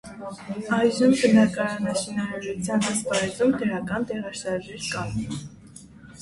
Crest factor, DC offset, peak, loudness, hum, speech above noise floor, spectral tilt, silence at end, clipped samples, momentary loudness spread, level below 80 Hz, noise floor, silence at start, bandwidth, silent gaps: 18 dB; under 0.1%; -8 dBFS; -24 LUFS; none; 22 dB; -5 dB/octave; 0 s; under 0.1%; 15 LU; -54 dBFS; -46 dBFS; 0.05 s; 11.5 kHz; none